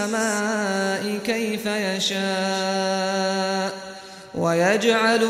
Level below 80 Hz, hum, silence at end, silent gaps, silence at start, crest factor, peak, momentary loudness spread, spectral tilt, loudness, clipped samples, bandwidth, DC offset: -64 dBFS; none; 0 s; none; 0 s; 16 dB; -8 dBFS; 8 LU; -3.5 dB/octave; -22 LUFS; under 0.1%; 16 kHz; under 0.1%